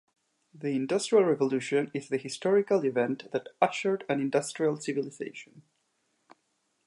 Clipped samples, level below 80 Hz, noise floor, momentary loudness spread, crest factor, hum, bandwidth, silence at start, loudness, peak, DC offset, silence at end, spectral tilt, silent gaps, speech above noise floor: under 0.1%; -82 dBFS; -76 dBFS; 11 LU; 22 dB; none; 11.5 kHz; 0.55 s; -29 LUFS; -8 dBFS; under 0.1%; 1.25 s; -5 dB/octave; none; 47 dB